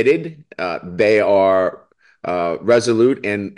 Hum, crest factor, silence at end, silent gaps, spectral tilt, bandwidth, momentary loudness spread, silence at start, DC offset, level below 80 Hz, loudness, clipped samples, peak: none; 12 dB; 0.05 s; none; -5.5 dB/octave; 11 kHz; 11 LU; 0 s; under 0.1%; -60 dBFS; -17 LUFS; under 0.1%; -4 dBFS